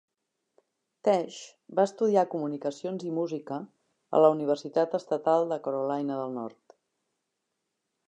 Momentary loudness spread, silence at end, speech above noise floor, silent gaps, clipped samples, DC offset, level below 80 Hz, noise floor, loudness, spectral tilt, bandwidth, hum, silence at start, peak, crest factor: 15 LU; 1.6 s; 55 dB; none; under 0.1%; under 0.1%; -86 dBFS; -82 dBFS; -28 LUFS; -6.5 dB/octave; 9.6 kHz; none; 1.05 s; -8 dBFS; 22 dB